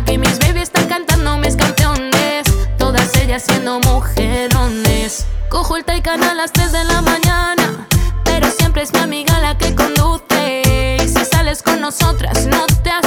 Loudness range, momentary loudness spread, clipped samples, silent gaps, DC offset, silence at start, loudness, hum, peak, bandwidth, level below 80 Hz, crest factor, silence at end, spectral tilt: 1 LU; 3 LU; under 0.1%; none; under 0.1%; 0 s; -14 LUFS; none; -2 dBFS; over 20 kHz; -18 dBFS; 10 dB; 0 s; -4.5 dB/octave